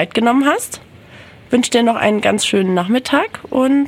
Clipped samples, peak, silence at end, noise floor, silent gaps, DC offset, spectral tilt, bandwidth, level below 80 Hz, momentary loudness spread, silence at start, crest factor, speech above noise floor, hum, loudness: under 0.1%; -2 dBFS; 0 s; -40 dBFS; none; under 0.1%; -4 dB/octave; 16 kHz; -54 dBFS; 7 LU; 0 s; 14 dB; 25 dB; none; -15 LUFS